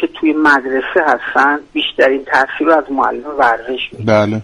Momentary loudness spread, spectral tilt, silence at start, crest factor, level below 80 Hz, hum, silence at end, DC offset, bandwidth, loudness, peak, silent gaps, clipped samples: 6 LU; -5.5 dB/octave; 0 s; 14 dB; -48 dBFS; none; 0 s; under 0.1%; 11 kHz; -14 LUFS; 0 dBFS; none; under 0.1%